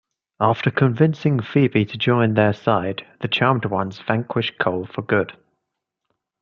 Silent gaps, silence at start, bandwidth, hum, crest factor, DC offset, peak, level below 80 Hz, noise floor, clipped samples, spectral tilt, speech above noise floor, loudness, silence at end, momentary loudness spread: none; 0.4 s; 6.8 kHz; none; 18 dB; under 0.1%; -2 dBFS; -60 dBFS; -80 dBFS; under 0.1%; -8.5 dB/octave; 60 dB; -20 LUFS; 1.1 s; 7 LU